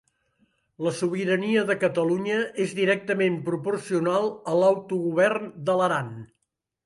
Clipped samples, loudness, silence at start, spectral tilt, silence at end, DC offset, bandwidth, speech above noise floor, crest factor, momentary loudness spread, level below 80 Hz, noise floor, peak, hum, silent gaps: under 0.1%; -25 LUFS; 0.8 s; -6 dB/octave; 0.6 s; under 0.1%; 11.5 kHz; 54 dB; 16 dB; 6 LU; -70 dBFS; -78 dBFS; -8 dBFS; none; none